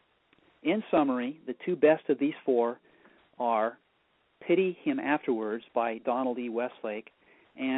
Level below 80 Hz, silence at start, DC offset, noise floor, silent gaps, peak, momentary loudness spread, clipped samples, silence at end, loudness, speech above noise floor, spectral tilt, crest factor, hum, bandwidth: -76 dBFS; 0.65 s; under 0.1%; -71 dBFS; none; -10 dBFS; 11 LU; under 0.1%; 0 s; -29 LUFS; 42 dB; -10 dB/octave; 20 dB; none; 4.1 kHz